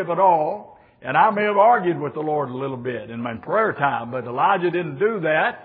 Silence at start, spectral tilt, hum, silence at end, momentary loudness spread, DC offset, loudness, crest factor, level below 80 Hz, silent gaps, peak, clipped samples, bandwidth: 0 s; -10 dB/octave; none; 0 s; 12 LU; under 0.1%; -21 LUFS; 16 dB; -66 dBFS; none; -4 dBFS; under 0.1%; 4.7 kHz